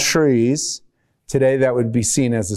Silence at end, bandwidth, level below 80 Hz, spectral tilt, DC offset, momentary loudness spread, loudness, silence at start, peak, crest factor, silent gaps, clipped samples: 0 s; 15 kHz; -48 dBFS; -4.5 dB/octave; under 0.1%; 9 LU; -18 LUFS; 0 s; -6 dBFS; 12 dB; none; under 0.1%